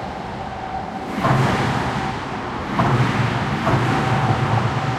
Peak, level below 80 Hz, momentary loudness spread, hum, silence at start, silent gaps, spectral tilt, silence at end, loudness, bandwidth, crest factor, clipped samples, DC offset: -4 dBFS; -40 dBFS; 10 LU; none; 0 s; none; -6.5 dB/octave; 0 s; -21 LUFS; 12.5 kHz; 16 dB; under 0.1%; under 0.1%